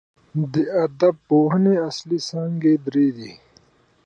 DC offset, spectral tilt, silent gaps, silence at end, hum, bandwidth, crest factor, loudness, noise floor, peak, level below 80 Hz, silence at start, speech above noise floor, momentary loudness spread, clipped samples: under 0.1%; -7.5 dB/octave; none; 0.7 s; none; 8.8 kHz; 16 dB; -20 LUFS; -57 dBFS; -6 dBFS; -66 dBFS; 0.35 s; 37 dB; 9 LU; under 0.1%